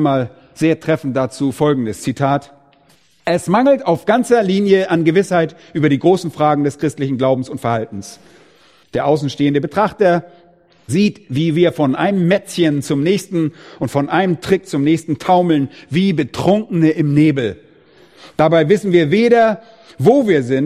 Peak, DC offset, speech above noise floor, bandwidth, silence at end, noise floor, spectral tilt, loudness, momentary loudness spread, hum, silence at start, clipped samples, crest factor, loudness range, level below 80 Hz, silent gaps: 0 dBFS; under 0.1%; 38 dB; 14.5 kHz; 0 s; -53 dBFS; -6.5 dB/octave; -16 LUFS; 7 LU; none; 0 s; under 0.1%; 16 dB; 4 LU; -52 dBFS; none